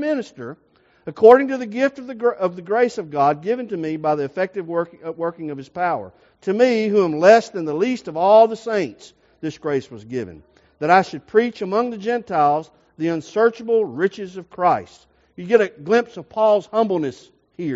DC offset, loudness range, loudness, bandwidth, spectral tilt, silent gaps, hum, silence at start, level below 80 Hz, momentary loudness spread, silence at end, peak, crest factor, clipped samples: under 0.1%; 5 LU; -19 LUFS; 7.8 kHz; -4.5 dB/octave; none; none; 0 s; -64 dBFS; 16 LU; 0 s; 0 dBFS; 20 dB; under 0.1%